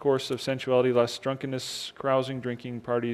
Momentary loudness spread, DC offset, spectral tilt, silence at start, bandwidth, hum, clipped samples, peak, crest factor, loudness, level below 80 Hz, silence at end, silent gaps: 10 LU; under 0.1%; -5 dB/octave; 0 s; 13.5 kHz; none; under 0.1%; -8 dBFS; 20 dB; -28 LUFS; -68 dBFS; 0 s; none